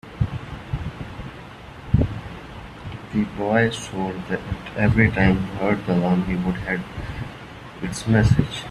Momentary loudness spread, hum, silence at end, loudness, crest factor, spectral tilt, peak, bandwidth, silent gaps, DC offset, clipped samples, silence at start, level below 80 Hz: 19 LU; none; 0 s; -22 LUFS; 20 dB; -7 dB/octave; -2 dBFS; 12 kHz; none; under 0.1%; under 0.1%; 0.05 s; -36 dBFS